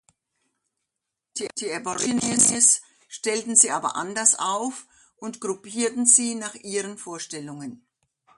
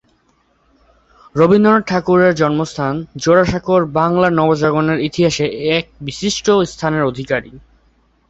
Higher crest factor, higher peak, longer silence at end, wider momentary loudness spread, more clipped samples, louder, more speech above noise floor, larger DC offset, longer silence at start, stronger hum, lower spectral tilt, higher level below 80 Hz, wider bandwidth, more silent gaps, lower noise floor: first, 24 dB vs 14 dB; about the same, -2 dBFS vs 0 dBFS; about the same, 0.6 s vs 0.7 s; first, 20 LU vs 9 LU; neither; second, -21 LUFS vs -15 LUFS; first, 60 dB vs 44 dB; neither; about the same, 1.35 s vs 1.35 s; neither; second, -1.5 dB/octave vs -5.5 dB/octave; second, -68 dBFS vs -44 dBFS; first, 11.5 kHz vs 8.2 kHz; neither; first, -84 dBFS vs -58 dBFS